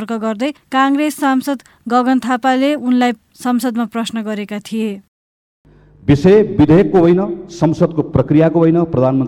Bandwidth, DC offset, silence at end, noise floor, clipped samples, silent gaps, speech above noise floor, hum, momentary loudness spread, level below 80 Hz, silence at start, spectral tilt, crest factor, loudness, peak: 17 kHz; under 0.1%; 0 s; under -90 dBFS; under 0.1%; 5.08-5.65 s; over 76 dB; none; 12 LU; -44 dBFS; 0 s; -7 dB/octave; 12 dB; -15 LUFS; -2 dBFS